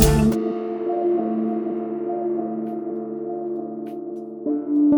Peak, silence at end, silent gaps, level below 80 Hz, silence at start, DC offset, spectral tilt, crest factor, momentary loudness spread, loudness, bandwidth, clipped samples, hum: 0 dBFS; 0 s; none; -34 dBFS; 0 s; under 0.1%; -6.5 dB/octave; 22 dB; 10 LU; -24 LUFS; 18 kHz; under 0.1%; none